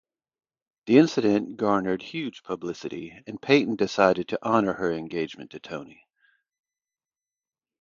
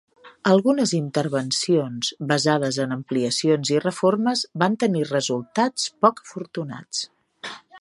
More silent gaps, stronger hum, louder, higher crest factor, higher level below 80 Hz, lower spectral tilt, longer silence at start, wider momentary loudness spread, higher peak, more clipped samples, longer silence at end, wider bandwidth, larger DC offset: neither; neither; about the same, -24 LUFS vs -22 LUFS; about the same, 22 dB vs 20 dB; first, -64 dBFS vs -70 dBFS; first, -6 dB/octave vs -4.5 dB/octave; first, 0.85 s vs 0.25 s; first, 17 LU vs 12 LU; about the same, -4 dBFS vs -2 dBFS; neither; first, 1.95 s vs 0 s; second, 7.4 kHz vs 11.5 kHz; neither